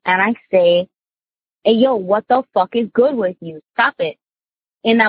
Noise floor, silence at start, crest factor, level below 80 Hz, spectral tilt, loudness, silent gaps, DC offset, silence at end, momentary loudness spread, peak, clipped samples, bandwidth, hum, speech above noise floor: under -90 dBFS; 0.05 s; 16 dB; -66 dBFS; -9 dB/octave; -17 LUFS; 4.74-4.78 s; under 0.1%; 0 s; 10 LU; -2 dBFS; under 0.1%; 5 kHz; none; over 74 dB